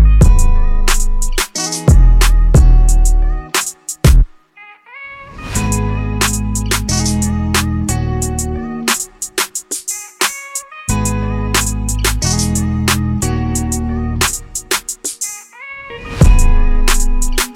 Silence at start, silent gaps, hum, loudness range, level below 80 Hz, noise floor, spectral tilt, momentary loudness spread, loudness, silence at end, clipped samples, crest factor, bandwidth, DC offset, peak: 0 s; none; none; 5 LU; -14 dBFS; -41 dBFS; -4 dB/octave; 11 LU; -15 LUFS; 0 s; under 0.1%; 12 dB; 16.5 kHz; under 0.1%; 0 dBFS